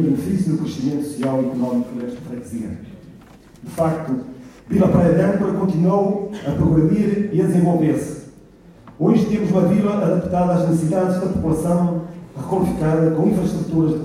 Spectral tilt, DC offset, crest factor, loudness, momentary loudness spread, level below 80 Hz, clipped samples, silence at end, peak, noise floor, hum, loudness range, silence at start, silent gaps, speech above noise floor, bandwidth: -8.5 dB/octave; under 0.1%; 16 dB; -19 LUFS; 13 LU; -44 dBFS; under 0.1%; 0 s; -4 dBFS; -45 dBFS; none; 7 LU; 0 s; none; 27 dB; 14 kHz